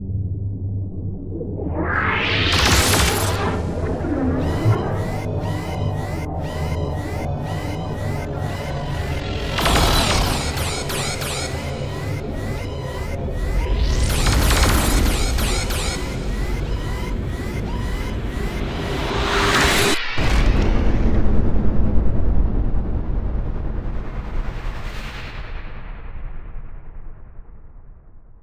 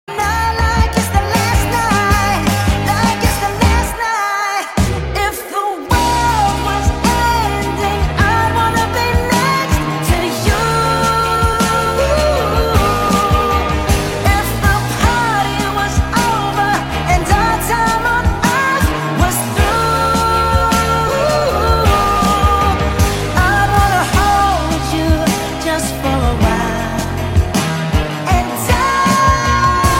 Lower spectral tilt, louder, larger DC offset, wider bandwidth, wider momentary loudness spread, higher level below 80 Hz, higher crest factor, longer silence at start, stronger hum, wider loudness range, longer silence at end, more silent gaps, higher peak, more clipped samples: about the same, -4.5 dB/octave vs -4.5 dB/octave; second, -22 LUFS vs -14 LUFS; neither; about the same, 16 kHz vs 17 kHz; first, 14 LU vs 4 LU; about the same, -24 dBFS vs -22 dBFS; about the same, 16 dB vs 14 dB; about the same, 0 s vs 0.1 s; neither; first, 10 LU vs 3 LU; about the same, 0.1 s vs 0 s; neither; second, -4 dBFS vs 0 dBFS; neither